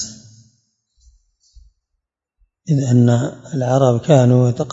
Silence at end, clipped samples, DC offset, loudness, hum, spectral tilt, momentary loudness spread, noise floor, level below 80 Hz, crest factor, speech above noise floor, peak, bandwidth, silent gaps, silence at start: 0 s; under 0.1%; under 0.1%; -15 LUFS; none; -7.5 dB/octave; 12 LU; -76 dBFS; -54 dBFS; 18 dB; 62 dB; 0 dBFS; 7.8 kHz; none; 0 s